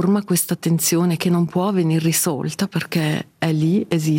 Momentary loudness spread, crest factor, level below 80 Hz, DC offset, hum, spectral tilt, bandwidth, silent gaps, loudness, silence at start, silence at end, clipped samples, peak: 5 LU; 14 dB; -62 dBFS; under 0.1%; none; -5 dB/octave; 17 kHz; none; -19 LUFS; 0 s; 0 s; under 0.1%; -6 dBFS